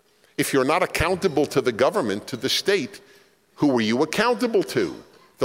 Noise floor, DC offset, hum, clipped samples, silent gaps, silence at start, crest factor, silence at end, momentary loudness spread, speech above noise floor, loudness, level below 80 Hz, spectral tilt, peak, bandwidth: -55 dBFS; under 0.1%; none; under 0.1%; none; 0.4 s; 16 dB; 0 s; 7 LU; 33 dB; -22 LUFS; -50 dBFS; -4.5 dB/octave; -6 dBFS; 16.5 kHz